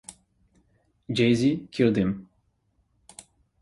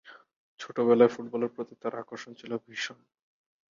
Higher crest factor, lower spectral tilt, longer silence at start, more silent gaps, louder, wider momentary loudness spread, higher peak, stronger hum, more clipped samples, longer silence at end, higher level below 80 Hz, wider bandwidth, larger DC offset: about the same, 20 dB vs 22 dB; about the same, -6.5 dB/octave vs -5.5 dB/octave; about the same, 0.1 s vs 0.1 s; second, none vs 0.36-0.57 s; first, -24 LUFS vs -29 LUFS; first, 25 LU vs 19 LU; about the same, -8 dBFS vs -8 dBFS; neither; neither; first, 1.4 s vs 0.75 s; first, -56 dBFS vs -78 dBFS; first, 11.5 kHz vs 7.4 kHz; neither